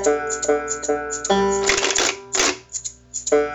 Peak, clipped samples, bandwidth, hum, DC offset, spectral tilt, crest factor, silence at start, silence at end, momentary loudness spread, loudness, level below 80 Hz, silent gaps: -4 dBFS; under 0.1%; 17.5 kHz; none; under 0.1%; -1.5 dB/octave; 18 dB; 0 s; 0 s; 10 LU; -20 LUFS; -46 dBFS; none